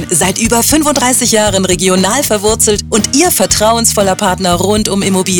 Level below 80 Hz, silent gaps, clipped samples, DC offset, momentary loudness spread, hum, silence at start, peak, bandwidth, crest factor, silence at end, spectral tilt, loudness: -30 dBFS; none; under 0.1%; 0.3%; 3 LU; none; 0 s; 0 dBFS; over 20 kHz; 10 dB; 0 s; -3 dB/octave; -10 LUFS